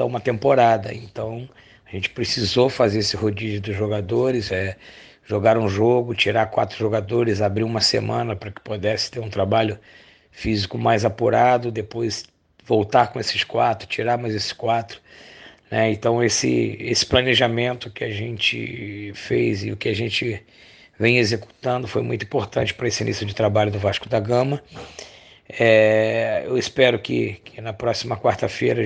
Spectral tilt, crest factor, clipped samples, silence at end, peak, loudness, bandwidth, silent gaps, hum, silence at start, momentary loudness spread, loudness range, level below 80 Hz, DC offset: -5 dB/octave; 20 dB; under 0.1%; 0 s; -2 dBFS; -21 LUFS; 9.8 kHz; none; none; 0 s; 13 LU; 3 LU; -50 dBFS; under 0.1%